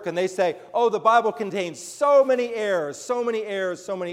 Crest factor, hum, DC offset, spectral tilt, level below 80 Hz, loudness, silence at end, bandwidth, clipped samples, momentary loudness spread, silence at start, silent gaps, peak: 16 dB; none; under 0.1%; -4 dB/octave; -76 dBFS; -23 LUFS; 0 s; 14.5 kHz; under 0.1%; 10 LU; 0 s; none; -6 dBFS